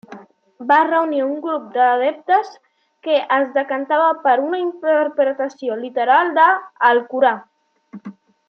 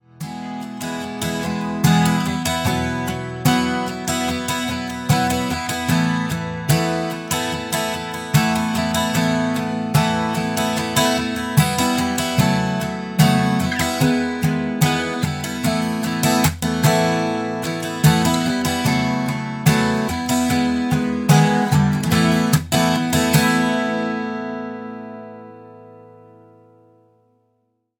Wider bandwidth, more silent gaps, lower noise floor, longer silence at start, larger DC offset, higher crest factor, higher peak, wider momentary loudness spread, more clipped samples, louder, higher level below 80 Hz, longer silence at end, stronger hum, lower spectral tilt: second, 6.6 kHz vs 19 kHz; neither; second, -41 dBFS vs -68 dBFS; about the same, 0.1 s vs 0.2 s; neither; about the same, 16 dB vs 18 dB; about the same, -2 dBFS vs -2 dBFS; about the same, 11 LU vs 9 LU; neither; about the same, -17 LUFS vs -19 LUFS; second, -82 dBFS vs -44 dBFS; second, 0.4 s vs 2 s; neither; about the same, -5 dB/octave vs -5 dB/octave